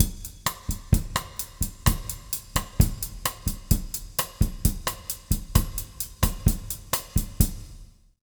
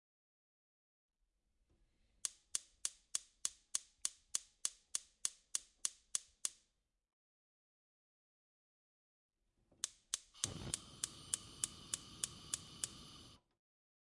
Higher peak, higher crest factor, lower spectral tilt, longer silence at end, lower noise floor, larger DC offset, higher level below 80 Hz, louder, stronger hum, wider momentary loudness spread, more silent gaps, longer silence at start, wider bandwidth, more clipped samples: first, 0 dBFS vs -16 dBFS; second, 26 dB vs 34 dB; first, -4 dB/octave vs 0 dB/octave; second, 0.35 s vs 0.7 s; second, -47 dBFS vs -83 dBFS; neither; first, -30 dBFS vs -74 dBFS; first, -28 LUFS vs -44 LUFS; neither; first, 8 LU vs 5 LU; second, none vs 7.13-9.29 s; second, 0 s vs 2.25 s; first, over 20 kHz vs 12 kHz; neither